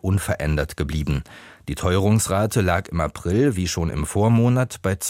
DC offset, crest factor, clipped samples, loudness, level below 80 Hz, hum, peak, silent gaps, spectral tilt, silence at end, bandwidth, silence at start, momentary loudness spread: under 0.1%; 16 dB; under 0.1%; -21 LUFS; -34 dBFS; none; -6 dBFS; none; -6 dB/octave; 0 s; 16.5 kHz; 0.05 s; 8 LU